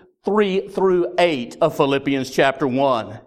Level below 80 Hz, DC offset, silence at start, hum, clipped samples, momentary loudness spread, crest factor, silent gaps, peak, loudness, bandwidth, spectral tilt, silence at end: -58 dBFS; under 0.1%; 0.25 s; none; under 0.1%; 3 LU; 16 dB; none; -2 dBFS; -19 LUFS; 15.5 kHz; -5.5 dB/octave; 0.05 s